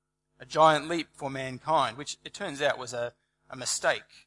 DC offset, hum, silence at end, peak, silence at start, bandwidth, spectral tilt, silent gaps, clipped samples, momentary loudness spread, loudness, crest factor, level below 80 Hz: under 0.1%; none; 0.25 s; -8 dBFS; 0.4 s; 11.5 kHz; -3 dB/octave; none; under 0.1%; 15 LU; -29 LUFS; 22 dB; -68 dBFS